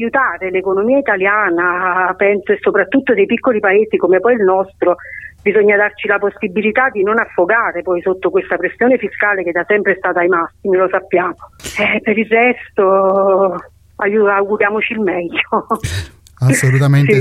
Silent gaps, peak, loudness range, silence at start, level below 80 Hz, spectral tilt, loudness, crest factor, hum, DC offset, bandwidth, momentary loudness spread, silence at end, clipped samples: none; 0 dBFS; 2 LU; 0 s; -46 dBFS; -6.5 dB/octave; -14 LUFS; 14 dB; none; under 0.1%; 14 kHz; 6 LU; 0 s; under 0.1%